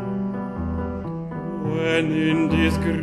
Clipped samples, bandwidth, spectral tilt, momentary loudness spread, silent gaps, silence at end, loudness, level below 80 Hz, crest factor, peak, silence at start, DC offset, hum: under 0.1%; 12.5 kHz; -7 dB/octave; 10 LU; none; 0 s; -23 LUFS; -38 dBFS; 14 dB; -8 dBFS; 0 s; under 0.1%; none